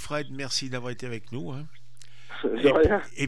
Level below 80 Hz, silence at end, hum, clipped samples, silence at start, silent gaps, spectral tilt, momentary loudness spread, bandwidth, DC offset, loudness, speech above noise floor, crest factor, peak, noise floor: -46 dBFS; 0 s; none; under 0.1%; 0 s; none; -4.5 dB/octave; 19 LU; 12.5 kHz; 2%; -27 LUFS; 28 dB; 18 dB; -8 dBFS; -54 dBFS